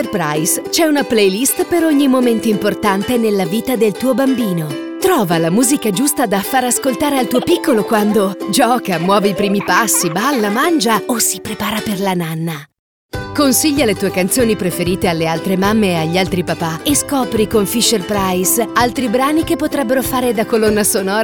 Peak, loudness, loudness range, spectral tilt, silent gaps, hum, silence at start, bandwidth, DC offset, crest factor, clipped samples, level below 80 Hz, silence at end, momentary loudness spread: 0 dBFS; -14 LUFS; 2 LU; -4 dB/octave; 12.79-13.09 s; none; 0 s; 19.5 kHz; 0.2%; 14 dB; under 0.1%; -42 dBFS; 0 s; 5 LU